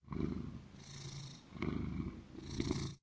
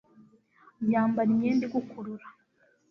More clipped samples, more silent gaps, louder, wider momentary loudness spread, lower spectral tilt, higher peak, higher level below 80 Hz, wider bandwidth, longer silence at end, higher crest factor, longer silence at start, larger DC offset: neither; neither; second, -44 LUFS vs -27 LUFS; second, 11 LU vs 15 LU; second, -6 dB/octave vs -8.5 dB/octave; second, -22 dBFS vs -14 dBFS; first, -52 dBFS vs -70 dBFS; first, 8 kHz vs 6.2 kHz; second, 0.05 s vs 0.6 s; about the same, 20 dB vs 16 dB; second, 0.05 s vs 0.8 s; neither